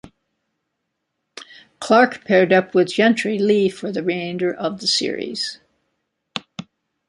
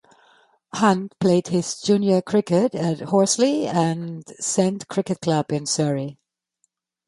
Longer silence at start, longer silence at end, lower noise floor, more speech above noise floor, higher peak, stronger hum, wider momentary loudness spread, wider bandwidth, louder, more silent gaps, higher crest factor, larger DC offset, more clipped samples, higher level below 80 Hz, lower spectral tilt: second, 0.05 s vs 0.75 s; second, 0.45 s vs 0.95 s; first, -76 dBFS vs -71 dBFS; first, 58 dB vs 51 dB; about the same, -2 dBFS vs -4 dBFS; neither; first, 19 LU vs 8 LU; about the same, 11.5 kHz vs 11.5 kHz; first, -18 LUFS vs -21 LUFS; neither; about the same, 18 dB vs 18 dB; neither; neither; about the same, -66 dBFS vs -64 dBFS; about the same, -4.5 dB/octave vs -5 dB/octave